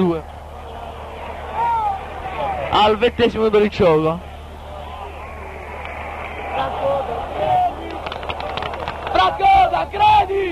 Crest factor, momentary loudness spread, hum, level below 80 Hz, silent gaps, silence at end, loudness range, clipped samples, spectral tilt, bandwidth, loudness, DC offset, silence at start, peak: 16 dB; 18 LU; none; -36 dBFS; none; 0 s; 6 LU; under 0.1%; -6 dB/octave; 13.5 kHz; -19 LUFS; under 0.1%; 0 s; -4 dBFS